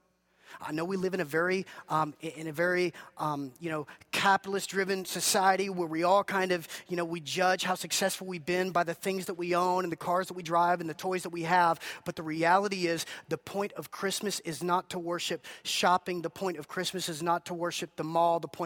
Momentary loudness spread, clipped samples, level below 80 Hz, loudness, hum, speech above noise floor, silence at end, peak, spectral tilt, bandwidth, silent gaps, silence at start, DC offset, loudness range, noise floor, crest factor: 10 LU; under 0.1%; -74 dBFS; -30 LUFS; none; 33 dB; 0 s; -10 dBFS; -3.5 dB/octave; 18 kHz; none; 0.5 s; under 0.1%; 3 LU; -63 dBFS; 20 dB